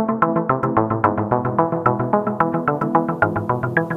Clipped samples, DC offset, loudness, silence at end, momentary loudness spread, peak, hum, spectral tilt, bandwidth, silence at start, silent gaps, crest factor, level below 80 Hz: under 0.1%; under 0.1%; -19 LUFS; 0 s; 2 LU; 0 dBFS; none; -10 dB/octave; 5 kHz; 0 s; none; 18 dB; -50 dBFS